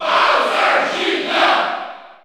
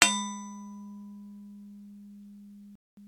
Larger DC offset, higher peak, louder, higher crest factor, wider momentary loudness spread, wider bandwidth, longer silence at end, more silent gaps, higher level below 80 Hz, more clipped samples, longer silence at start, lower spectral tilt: neither; about the same, -2 dBFS vs 0 dBFS; first, -15 LUFS vs -33 LUFS; second, 16 dB vs 34 dB; second, 10 LU vs 16 LU; second, 16 kHz vs 18 kHz; about the same, 0.1 s vs 0 s; second, none vs 2.75-2.97 s; first, -66 dBFS vs -72 dBFS; neither; about the same, 0 s vs 0 s; about the same, -2 dB/octave vs -1 dB/octave